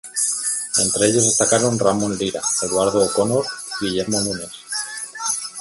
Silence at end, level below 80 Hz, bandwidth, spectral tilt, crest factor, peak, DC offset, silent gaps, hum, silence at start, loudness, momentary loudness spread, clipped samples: 0 s; -54 dBFS; 12 kHz; -3 dB/octave; 18 dB; -2 dBFS; under 0.1%; none; none; 0.05 s; -19 LUFS; 10 LU; under 0.1%